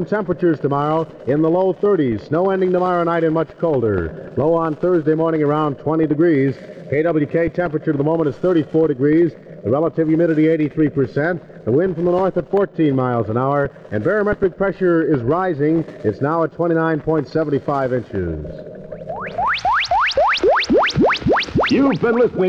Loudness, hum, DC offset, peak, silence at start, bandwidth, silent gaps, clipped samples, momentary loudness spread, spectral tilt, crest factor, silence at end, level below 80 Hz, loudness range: -18 LUFS; none; under 0.1%; -4 dBFS; 0 s; 7.4 kHz; none; under 0.1%; 7 LU; -7.5 dB/octave; 14 dB; 0 s; -44 dBFS; 2 LU